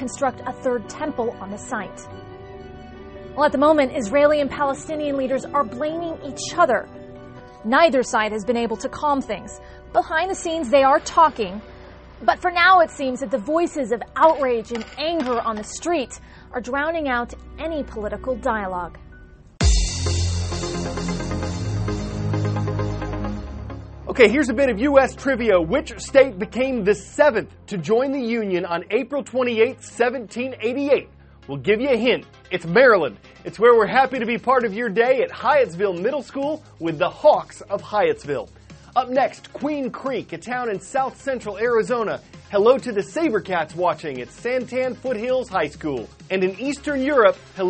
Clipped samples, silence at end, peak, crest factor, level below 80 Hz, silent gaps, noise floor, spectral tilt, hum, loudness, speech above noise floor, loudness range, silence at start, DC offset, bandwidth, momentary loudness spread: under 0.1%; 0 s; 0 dBFS; 20 dB; -38 dBFS; none; -45 dBFS; -5 dB/octave; none; -21 LUFS; 24 dB; 7 LU; 0 s; under 0.1%; 8.8 kHz; 14 LU